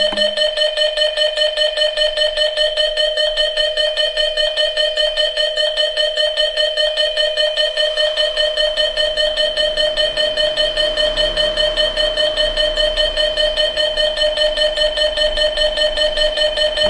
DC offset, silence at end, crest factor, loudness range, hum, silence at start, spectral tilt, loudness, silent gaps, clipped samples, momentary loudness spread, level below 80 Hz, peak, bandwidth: under 0.1%; 0 s; 12 dB; 0 LU; none; 0 s; -0.5 dB/octave; -15 LUFS; none; under 0.1%; 0 LU; -34 dBFS; -4 dBFS; 11 kHz